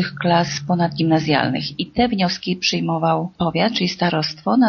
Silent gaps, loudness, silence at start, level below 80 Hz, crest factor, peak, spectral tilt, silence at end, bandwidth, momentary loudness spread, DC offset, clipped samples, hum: none; -19 LUFS; 0 s; -50 dBFS; 18 dB; -2 dBFS; -4 dB/octave; 0 s; 6.8 kHz; 4 LU; under 0.1%; under 0.1%; none